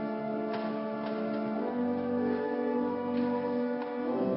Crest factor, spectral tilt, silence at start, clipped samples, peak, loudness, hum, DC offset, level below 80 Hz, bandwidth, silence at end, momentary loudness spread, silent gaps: 12 dB; -10.5 dB/octave; 0 s; under 0.1%; -20 dBFS; -32 LUFS; none; under 0.1%; -72 dBFS; 5.8 kHz; 0 s; 3 LU; none